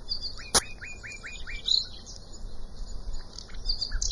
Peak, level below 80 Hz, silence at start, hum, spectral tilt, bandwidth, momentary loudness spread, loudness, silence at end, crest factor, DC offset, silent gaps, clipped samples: -6 dBFS; -38 dBFS; 0 s; none; -0.5 dB/octave; 11.5 kHz; 20 LU; -29 LUFS; 0 s; 24 dB; under 0.1%; none; under 0.1%